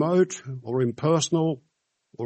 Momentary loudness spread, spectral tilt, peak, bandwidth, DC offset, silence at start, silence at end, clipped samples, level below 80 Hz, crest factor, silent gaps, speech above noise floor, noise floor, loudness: 10 LU; -5.5 dB/octave; -10 dBFS; 8.4 kHz; under 0.1%; 0 s; 0 s; under 0.1%; -68 dBFS; 16 dB; none; 37 dB; -61 dBFS; -25 LUFS